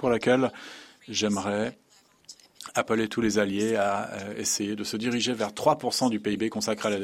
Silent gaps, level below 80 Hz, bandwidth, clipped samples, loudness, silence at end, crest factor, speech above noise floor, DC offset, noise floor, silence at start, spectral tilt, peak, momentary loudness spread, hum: none; -62 dBFS; 16 kHz; under 0.1%; -27 LUFS; 0 s; 20 dB; 26 dB; under 0.1%; -52 dBFS; 0 s; -3.5 dB/octave; -8 dBFS; 8 LU; none